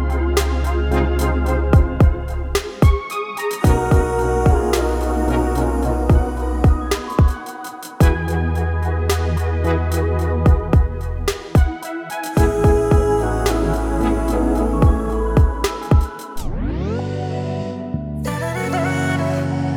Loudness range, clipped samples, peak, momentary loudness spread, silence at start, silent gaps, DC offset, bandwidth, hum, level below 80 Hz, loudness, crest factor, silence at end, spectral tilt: 4 LU; under 0.1%; -2 dBFS; 9 LU; 0 s; none; under 0.1%; 17.5 kHz; none; -20 dBFS; -19 LUFS; 14 dB; 0 s; -7 dB/octave